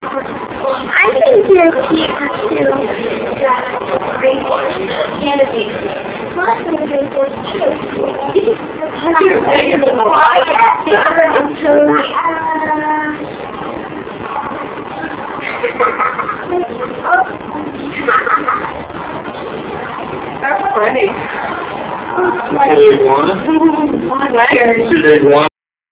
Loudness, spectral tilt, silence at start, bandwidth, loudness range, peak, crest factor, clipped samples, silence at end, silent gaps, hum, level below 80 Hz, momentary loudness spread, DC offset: -13 LUFS; -9 dB/octave; 0 s; 4 kHz; 7 LU; 0 dBFS; 14 dB; 0.2%; 0.45 s; none; none; -46 dBFS; 14 LU; under 0.1%